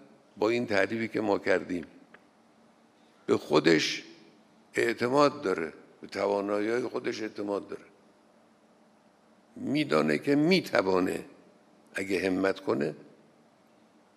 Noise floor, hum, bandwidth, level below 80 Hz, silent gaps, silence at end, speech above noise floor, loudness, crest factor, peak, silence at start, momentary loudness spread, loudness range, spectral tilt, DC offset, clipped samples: -62 dBFS; none; 14.5 kHz; -74 dBFS; none; 1.15 s; 34 dB; -29 LUFS; 22 dB; -8 dBFS; 0.35 s; 14 LU; 6 LU; -5 dB/octave; under 0.1%; under 0.1%